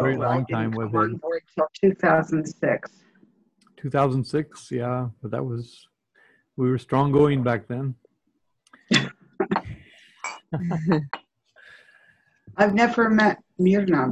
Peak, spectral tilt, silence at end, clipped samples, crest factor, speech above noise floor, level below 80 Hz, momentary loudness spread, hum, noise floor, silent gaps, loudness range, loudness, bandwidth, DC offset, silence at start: -4 dBFS; -6.5 dB/octave; 0 s; under 0.1%; 20 dB; 51 dB; -56 dBFS; 16 LU; none; -73 dBFS; none; 5 LU; -23 LUFS; 10.5 kHz; under 0.1%; 0 s